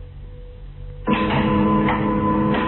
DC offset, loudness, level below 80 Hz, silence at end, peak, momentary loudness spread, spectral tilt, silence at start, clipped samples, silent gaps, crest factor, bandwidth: under 0.1%; -19 LUFS; -36 dBFS; 0 s; -6 dBFS; 22 LU; -11 dB/octave; 0 s; under 0.1%; none; 14 dB; 4.2 kHz